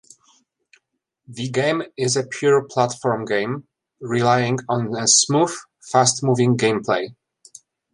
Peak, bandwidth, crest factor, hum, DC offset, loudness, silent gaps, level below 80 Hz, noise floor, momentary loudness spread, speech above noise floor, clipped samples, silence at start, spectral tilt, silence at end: -2 dBFS; 11.5 kHz; 18 dB; none; under 0.1%; -19 LUFS; none; -64 dBFS; -73 dBFS; 13 LU; 53 dB; under 0.1%; 1.3 s; -3.5 dB/octave; 0.8 s